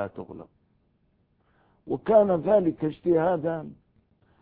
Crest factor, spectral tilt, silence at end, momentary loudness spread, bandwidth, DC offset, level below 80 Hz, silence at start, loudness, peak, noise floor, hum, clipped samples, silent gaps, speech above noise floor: 20 dB; -12 dB/octave; 0.7 s; 22 LU; 4.1 kHz; under 0.1%; -60 dBFS; 0 s; -24 LUFS; -6 dBFS; -68 dBFS; none; under 0.1%; none; 44 dB